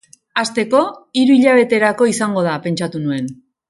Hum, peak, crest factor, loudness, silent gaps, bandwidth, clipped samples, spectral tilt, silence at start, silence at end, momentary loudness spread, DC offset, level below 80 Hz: none; 0 dBFS; 16 dB; -16 LUFS; none; 11.5 kHz; under 0.1%; -5 dB/octave; 0.35 s; 0.35 s; 10 LU; under 0.1%; -62 dBFS